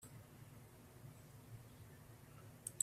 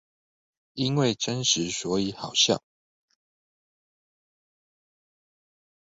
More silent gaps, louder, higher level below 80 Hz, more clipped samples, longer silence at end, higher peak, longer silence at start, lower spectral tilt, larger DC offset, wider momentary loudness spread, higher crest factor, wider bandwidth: neither; second, -58 LUFS vs -25 LUFS; second, -74 dBFS vs -64 dBFS; neither; second, 0 s vs 3.25 s; second, -20 dBFS vs -8 dBFS; second, 0 s vs 0.75 s; about the same, -3 dB/octave vs -3.5 dB/octave; neither; about the same, 7 LU vs 8 LU; first, 34 dB vs 22 dB; first, 15.5 kHz vs 8 kHz